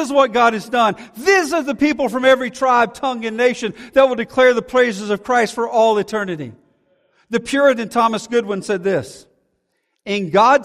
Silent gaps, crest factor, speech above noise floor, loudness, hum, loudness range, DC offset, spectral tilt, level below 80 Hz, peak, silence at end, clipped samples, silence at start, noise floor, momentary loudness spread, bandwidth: none; 16 dB; 53 dB; -17 LUFS; none; 4 LU; under 0.1%; -4.5 dB/octave; -56 dBFS; -2 dBFS; 0 s; under 0.1%; 0 s; -70 dBFS; 9 LU; 15 kHz